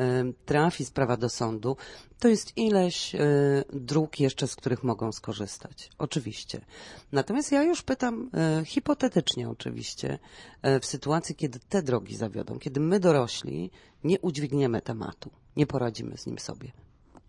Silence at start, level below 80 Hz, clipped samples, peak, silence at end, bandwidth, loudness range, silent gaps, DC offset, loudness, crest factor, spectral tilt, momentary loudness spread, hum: 0 s; -58 dBFS; under 0.1%; -10 dBFS; 0.55 s; 11.5 kHz; 4 LU; none; under 0.1%; -28 LUFS; 18 dB; -5.5 dB/octave; 13 LU; none